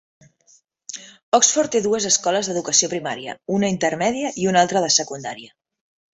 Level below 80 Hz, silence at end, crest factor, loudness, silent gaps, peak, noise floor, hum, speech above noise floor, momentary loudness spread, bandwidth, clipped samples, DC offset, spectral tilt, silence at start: -62 dBFS; 0.65 s; 20 dB; -19 LUFS; 1.23-1.32 s; -2 dBFS; -58 dBFS; none; 37 dB; 17 LU; 8.4 kHz; under 0.1%; under 0.1%; -2.5 dB/octave; 0.9 s